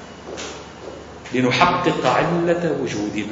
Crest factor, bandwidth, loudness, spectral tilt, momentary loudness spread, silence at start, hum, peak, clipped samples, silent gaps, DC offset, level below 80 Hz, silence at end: 22 dB; 8 kHz; -19 LUFS; -5 dB/octave; 20 LU; 0 s; none; 0 dBFS; under 0.1%; none; under 0.1%; -48 dBFS; 0 s